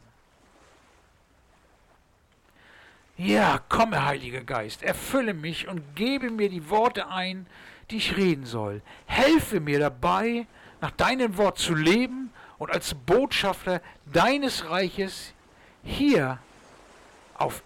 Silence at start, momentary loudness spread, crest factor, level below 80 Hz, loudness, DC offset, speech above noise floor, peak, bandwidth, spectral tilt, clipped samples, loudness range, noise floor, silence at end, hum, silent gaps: 3.2 s; 14 LU; 12 dB; -50 dBFS; -25 LUFS; under 0.1%; 37 dB; -14 dBFS; 19 kHz; -5 dB/octave; under 0.1%; 3 LU; -62 dBFS; 0.05 s; none; none